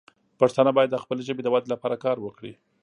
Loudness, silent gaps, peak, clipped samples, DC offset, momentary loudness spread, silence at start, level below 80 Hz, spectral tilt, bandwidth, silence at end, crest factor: -24 LUFS; none; -4 dBFS; under 0.1%; under 0.1%; 15 LU; 0.4 s; -72 dBFS; -6.5 dB/octave; 10.5 kHz; 0.3 s; 20 dB